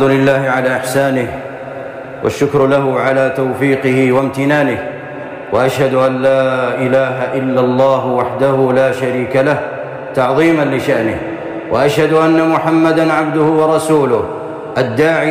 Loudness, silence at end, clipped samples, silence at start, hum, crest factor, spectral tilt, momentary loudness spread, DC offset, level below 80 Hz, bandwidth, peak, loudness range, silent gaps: -13 LUFS; 0 s; under 0.1%; 0 s; none; 10 dB; -6.5 dB/octave; 11 LU; under 0.1%; -50 dBFS; 15.5 kHz; -2 dBFS; 2 LU; none